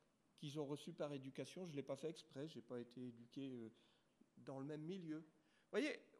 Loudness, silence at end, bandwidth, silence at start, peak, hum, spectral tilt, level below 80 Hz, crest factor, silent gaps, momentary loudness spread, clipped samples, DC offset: -51 LUFS; 0 s; 13 kHz; 0.4 s; -30 dBFS; none; -6 dB/octave; under -90 dBFS; 22 dB; none; 10 LU; under 0.1%; under 0.1%